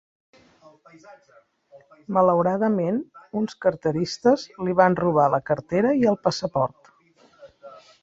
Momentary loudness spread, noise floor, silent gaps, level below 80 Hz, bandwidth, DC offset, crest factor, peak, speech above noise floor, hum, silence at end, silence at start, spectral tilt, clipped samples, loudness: 8 LU; -57 dBFS; none; -60 dBFS; 7.8 kHz; under 0.1%; 20 dB; -4 dBFS; 35 dB; none; 0.25 s; 1.1 s; -6.5 dB/octave; under 0.1%; -22 LUFS